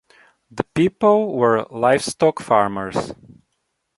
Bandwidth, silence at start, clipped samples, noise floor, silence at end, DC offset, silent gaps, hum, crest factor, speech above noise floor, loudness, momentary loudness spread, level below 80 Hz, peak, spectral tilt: 11.5 kHz; 0.55 s; under 0.1%; -73 dBFS; 0.85 s; under 0.1%; none; none; 18 dB; 55 dB; -19 LUFS; 10 LU; -54 dBFS; -2 dBFS; -5.5 dB/octave